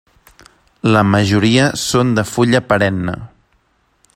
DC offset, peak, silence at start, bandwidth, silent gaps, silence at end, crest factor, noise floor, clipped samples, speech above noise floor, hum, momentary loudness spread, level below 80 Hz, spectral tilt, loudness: under 0.1%; 0 dBFS; 0.85 s; 16 kHz; none; 0.9 s; 16 dB; -59 dBFS; under 0.1%; 46 dB; none; 9 LU; -46 dBFS; -5.5 dB/octave; -14 LUFS